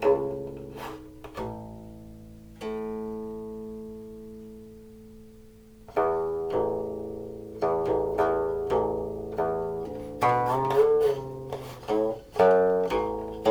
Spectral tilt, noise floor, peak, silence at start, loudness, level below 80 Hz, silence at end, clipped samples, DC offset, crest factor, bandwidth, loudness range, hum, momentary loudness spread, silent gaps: -7 dB/octave; -50 dBFS; -8 dBFS; 0 s; -27 LUFS; -52 dBFS; 0 s; under 0.1%; under 0.1%; 20 dB; 20 kHz; 14 LU; none; 21 LU; none